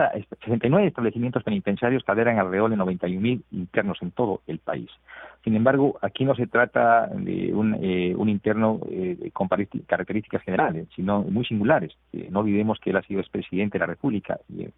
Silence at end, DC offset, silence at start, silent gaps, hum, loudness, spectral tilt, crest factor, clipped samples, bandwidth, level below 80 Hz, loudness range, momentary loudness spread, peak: 0.05 s; under 0.1%; 0 s; none; none; -24 LUFS; -11.5 dB/octave; 18 dB; under 0.1%; 4 kHz; -58 dBFS; 3 LU; 9 LU; -4 dBFS